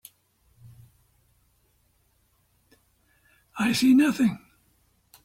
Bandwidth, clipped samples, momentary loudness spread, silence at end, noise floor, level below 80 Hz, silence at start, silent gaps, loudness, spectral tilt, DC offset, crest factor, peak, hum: 16.5 kHz; under 0.1%; 22 LU; 0.85 s; -67 dBFS; -64 dBFS; 3.55 s; none; -22 LUFS; -4.5 dB/octave; under 0.1%; 18 dB; -10 dBFS; none